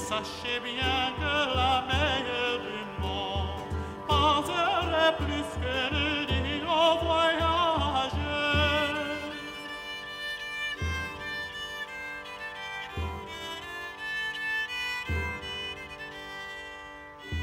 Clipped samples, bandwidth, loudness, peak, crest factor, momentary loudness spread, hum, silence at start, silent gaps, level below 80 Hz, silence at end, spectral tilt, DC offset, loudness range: under 0.1%; 16 kHz; -29 LUFS; -10 dBFS; 20 dB; 13 LU; none; 0 s; none; -42 dBFS; 0 s; -4.5 dB/octave; under 0.1%; 8 LU